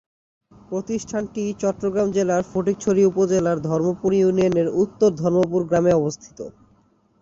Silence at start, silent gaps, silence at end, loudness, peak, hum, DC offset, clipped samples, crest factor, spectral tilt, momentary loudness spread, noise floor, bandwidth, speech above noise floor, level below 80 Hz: 0.7 s; none; 0.7 s; -21 LUFS; -6 dBFS; none; under 0.1%; under 0.1%; 16 dB; -7 dB/octave; 10 LU; -59 dBFS; 7.8 kHz; 39 dB; -54 dBFS